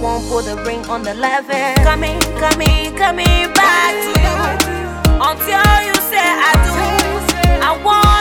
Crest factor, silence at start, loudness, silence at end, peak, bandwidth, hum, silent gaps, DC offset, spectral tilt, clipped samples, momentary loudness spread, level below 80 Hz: 12 dB; 0 s; -14 LUFS; 0 s; 0 dBFS; 19 kHz; none; none; under 0.1%; -4 dB/octave; under 0.1%; 8 LU; -20 dBFS